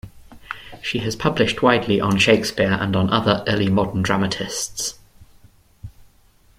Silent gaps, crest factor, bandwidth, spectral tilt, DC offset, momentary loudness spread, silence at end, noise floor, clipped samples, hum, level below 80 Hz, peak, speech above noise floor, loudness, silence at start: none; 20 dB; 15.5 kHz; -4.5 dB/octave; under 0.1%; 11 LU; 0.7 s; -54 dBFS; under 0.1%; none; -46 dBFS; -2 dBFS; 35 dB; -19 LUFS; 0.05 s